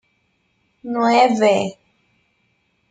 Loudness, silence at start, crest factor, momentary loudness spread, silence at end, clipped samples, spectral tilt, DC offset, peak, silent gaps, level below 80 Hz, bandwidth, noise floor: -17 LUFS; 0.85 s; 18 dB; 14 LU; 1.2 s; under 0.1%; -5 dB/octave; under 0.1%; -2 dBFS; none; -68 dBFS; 9.4 kHz; -66 dBFS